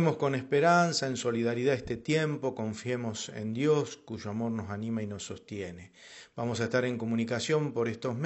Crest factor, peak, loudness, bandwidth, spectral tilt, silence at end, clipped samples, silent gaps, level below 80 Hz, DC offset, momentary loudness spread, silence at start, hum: 18 dB; -12 dBFS; -31 LUFS; 8.2 kHz; -5.5 dB/octave; 0 s; under 0.1%; none; -64 dBFS; under 0.1%; 13 LU; 0 s; none